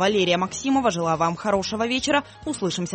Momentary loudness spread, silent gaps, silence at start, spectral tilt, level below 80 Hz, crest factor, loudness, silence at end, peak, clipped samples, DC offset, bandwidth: 5 LU; none; 0 s; -4 dB/octave; -52 dBFS; 16 dB; -23 LUFS; 0 s; -6 dBFS; under 0.1%; under 0.1%; 8.8 kHz